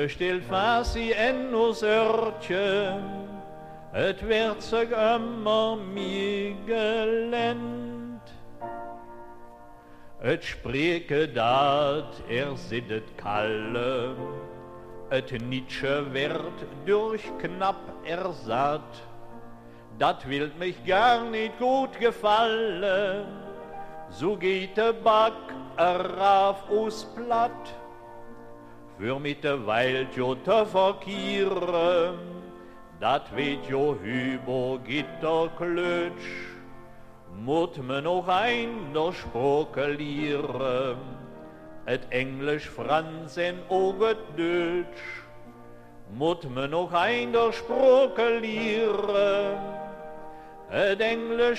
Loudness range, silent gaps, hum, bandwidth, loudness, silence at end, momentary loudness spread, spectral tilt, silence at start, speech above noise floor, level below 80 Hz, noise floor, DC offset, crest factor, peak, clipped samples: 6 LU; none; none; 13 kHz; -27 LUFS; 0 s; 18 LU; -5.5 dB/octave; 0 s; 21 dB; -52 dBFS; -47 dBFS; under 0.1%; 18 dB; -8 dBFS; under 0.1%